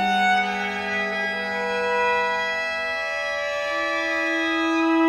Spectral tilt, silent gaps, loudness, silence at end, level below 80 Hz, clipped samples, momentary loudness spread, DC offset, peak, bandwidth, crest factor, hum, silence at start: -3.5 dB/octave; none; -23 LUFS; 0 s; -58 dBFS; under 0.1%; 5 LU; under 0.1%; -10 dBFS; 13 kHz; 14 dB; none; 0 s